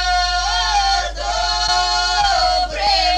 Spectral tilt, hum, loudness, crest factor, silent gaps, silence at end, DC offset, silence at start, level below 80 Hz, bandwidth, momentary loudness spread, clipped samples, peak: -1 dB/octave; none; -16 LUFS; 12 dB; none; 0 s; under 0.1%; 0 s; -30 dBFS; 12.5 kHz; 4 LU; under 0.1%; -4 dBFS